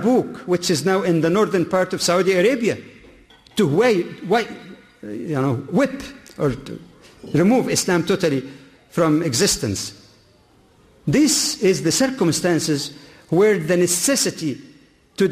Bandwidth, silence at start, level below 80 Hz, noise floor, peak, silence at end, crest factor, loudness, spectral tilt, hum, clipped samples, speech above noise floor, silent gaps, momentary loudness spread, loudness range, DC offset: 15.5 kHz; 0 s; -52 dBFS; -54 dBFS; -6 dBFS; 0 s; 14 dB; -19 LUFS; -4.5 dB/octave; none; under 0.1%; 35 dB; none; 14 LU; 4 LU; under 0.1%